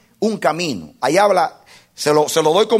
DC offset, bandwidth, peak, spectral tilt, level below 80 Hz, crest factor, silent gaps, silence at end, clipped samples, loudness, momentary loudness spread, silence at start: under 0.1%; 16 kHz; -2 dBFS; -4 dB/octave; -62 dBFS; 16 dB; none; 0 s; under 0.1%; -17 LUFS; 9 LU; 0.2 s